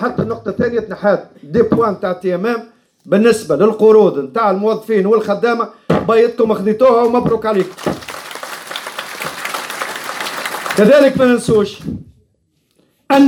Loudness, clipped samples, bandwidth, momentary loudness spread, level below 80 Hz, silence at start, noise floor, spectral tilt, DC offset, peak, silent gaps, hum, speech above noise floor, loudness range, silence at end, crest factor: -15 LUFS; under 0.1%; 19 kHz; 14 LU; -50 dBFS; 0 s; -62 dBFS; -6 dB/octave; under 0.1%; 0 dBFS; none; none; 49 dB; 5 LU; 0 s; 14 dB